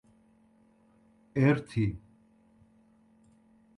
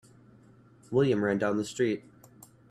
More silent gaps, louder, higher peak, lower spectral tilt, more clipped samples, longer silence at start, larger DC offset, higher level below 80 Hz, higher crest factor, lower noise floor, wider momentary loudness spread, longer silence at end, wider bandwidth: neither; about the same, -29 LUFS vs -29 LUFS; about the same, -12 dBFS vs -12 dBFS; first, -8.5 dB/octave vs -6.5 dB/octave; neither; first, 1.35 s vs 0.9 s; neither; first, -58 dBFS vs -66 dBFS; about the same, 22 dB vs 18 dB; first, -64 dBFS vs -57 dBFS; first, 12 LU vs 5 LU; first, 1.8 s vs 0.7 s; second, 11 kHz vs 14 kHz